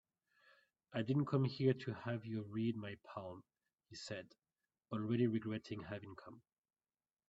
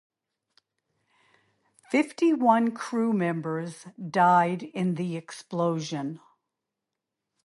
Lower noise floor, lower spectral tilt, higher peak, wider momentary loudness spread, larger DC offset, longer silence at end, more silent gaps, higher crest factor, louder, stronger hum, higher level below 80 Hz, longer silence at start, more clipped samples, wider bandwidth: first, under -90 dBFS vs -86 dBFS; about the same, -7.5 dB/octave vs -6.5 dB/octave; second, -22 dBFS vs -8 dBFS; about the same, 17 LU vs 15 LU; neither; second, 0.9 s vs 1.25 s; neither; about the same, 20 dB vs 20 dB; second, -41 LUFS vs -26 LUFS; neither; about the same, -78 dBFS vs -78 dBFS; second, 0.9 s vs 1.9 s; neither; second, 8.2 kHz vs 11.5 kHz